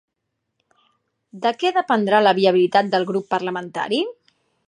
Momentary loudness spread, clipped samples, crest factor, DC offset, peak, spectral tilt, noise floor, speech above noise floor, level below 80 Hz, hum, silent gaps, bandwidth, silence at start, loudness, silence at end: 9 LU; under 0.1%; 18 dB; under 0.1%; -2 dBFS; -5.5 dB/octave; -77 dBFS; 59 dB; -74 dBFS; none; none; 10 kHz; 1.35 s; -19 LUFS; 0.55 s